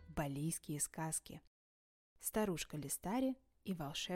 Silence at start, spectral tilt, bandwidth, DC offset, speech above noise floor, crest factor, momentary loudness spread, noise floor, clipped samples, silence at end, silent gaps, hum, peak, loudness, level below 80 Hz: 0 s; -4 dB/octave; 16.5 kHz; under 0.1%; over 48 dB; 18 dB; 8 LU; under -90 dBFS; under 0.1%; 0 s; 1.47-2.16 s; none; -24 dBFS; -42 LUFS; -62 dBFS